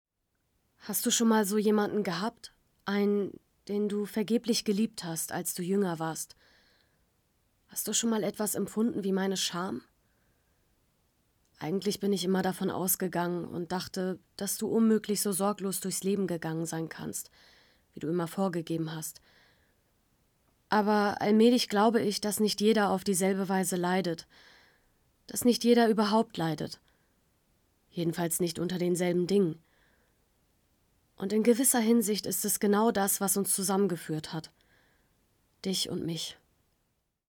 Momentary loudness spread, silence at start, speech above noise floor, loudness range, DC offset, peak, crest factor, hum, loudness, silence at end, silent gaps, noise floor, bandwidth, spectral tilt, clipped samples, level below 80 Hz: 12 LU; 0.85 s; 50 dB; 8 LU; under 0.1%; -12 dBFS; 18 dB; none; -29 LUFS; 0.95 s; none; -79 dBFS; 20 kHz; -4 dB/octave; under 0.1%; -70 dBFS